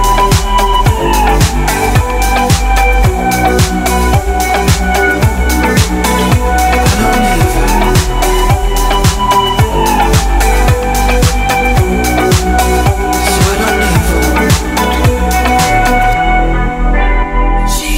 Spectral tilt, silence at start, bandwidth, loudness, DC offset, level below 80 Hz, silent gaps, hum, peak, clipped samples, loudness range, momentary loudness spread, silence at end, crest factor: -4.5 dB/octave; 0 s; 16.5 kHz; -11 LUFS; under 0.1%; -14 dBFS; none; none; 0 dBFS; under 0.1%; 0 LU; 3 LU; 0 s; 10 dB